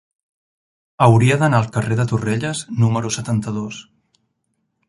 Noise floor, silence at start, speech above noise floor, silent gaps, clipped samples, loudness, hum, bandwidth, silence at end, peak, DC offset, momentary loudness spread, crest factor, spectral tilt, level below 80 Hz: -71 dBFS; 1 s; 54 dB; none; under 0.1%; -18 LUFS; none; 11.5 kHz; 1.1 s; -2 dBFS; under 0.1%; 12 LU; 18 dB; -6 dB/octave; -50 dBFS